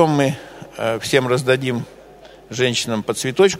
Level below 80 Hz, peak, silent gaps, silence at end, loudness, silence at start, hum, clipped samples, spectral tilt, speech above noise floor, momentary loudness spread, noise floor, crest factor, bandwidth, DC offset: -54 dBFS; 0 dBFS; none; 0 s; -19 LUFS; 0 s; none; under 0.1%; -4.5 dB/octave; 25 dB; 15 LU; -43 dBFS; 20 dB; 16 kHz; under 0.1%